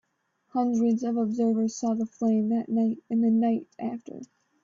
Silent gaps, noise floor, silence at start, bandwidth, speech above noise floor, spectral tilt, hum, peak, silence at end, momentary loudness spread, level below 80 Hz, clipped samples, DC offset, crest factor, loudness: none; -73 dBFS; 0.55 s; 7.6 kHz; 48 dB; -7.5 dB/octave; none; -14 dBFS; 0.4 s; 11 LU; -72 dBFS; under 0.1%; under 0.1%; 12 dB; -26 LUFS